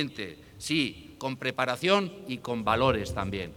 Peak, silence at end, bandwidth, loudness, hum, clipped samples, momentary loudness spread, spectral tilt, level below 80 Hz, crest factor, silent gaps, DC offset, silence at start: -10 dBFS; 0 s; 19.5 kHz; -29 LUFS; none; under 0.1%; 12 LU; -5 dB/octave; -50 dBFS; 20 dB; none; under 0.1%; 0 s